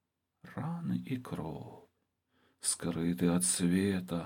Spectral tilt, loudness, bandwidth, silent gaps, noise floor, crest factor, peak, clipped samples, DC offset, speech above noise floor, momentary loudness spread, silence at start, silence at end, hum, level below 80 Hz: -4.5 dB/octave; -33 LUFS; 17.5 kHz; none; -79 dBFS; 18 dB; -16 dBFS; under 0.1%; under 0.1%; 45 dB; 15 LU; 0.45 s; 0 s; none; -68 dBFS